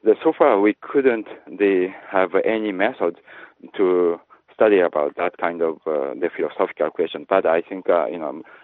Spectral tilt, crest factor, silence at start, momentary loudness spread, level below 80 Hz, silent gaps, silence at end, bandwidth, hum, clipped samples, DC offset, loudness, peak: -9.5 dB/octave; 18 dB; 0.05 s; 9 LU; -70 dBFS; none; 0.2 s; 4.1 kHz; none; under 0.1%; under 0.1%; -20 LUFS; -2 dBFS